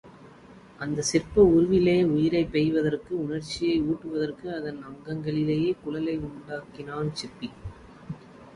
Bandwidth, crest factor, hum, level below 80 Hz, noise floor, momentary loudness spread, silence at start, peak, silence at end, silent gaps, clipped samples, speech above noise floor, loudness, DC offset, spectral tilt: 11.5 kHz; 20 dB; none; -50 dBFS; -50 dBFS; 18 LU; 0.05 s; -8 dBFS; 0.05 s; none; under 0.1%; 24 dB; -26 LUFS; under 0.1%; -6 dB/octave